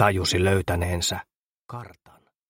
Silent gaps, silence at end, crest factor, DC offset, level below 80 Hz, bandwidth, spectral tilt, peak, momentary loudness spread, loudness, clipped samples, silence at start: 1.36-1.58 s, 1.64-1.68 s; 0.6 s; 22 dB; under 0.1%; -44 dBFS; 16.5 kHz; -4.5 dB/octave; -4 dBFS; 19 LU; -24 LUFS; under 0.1%; 0 s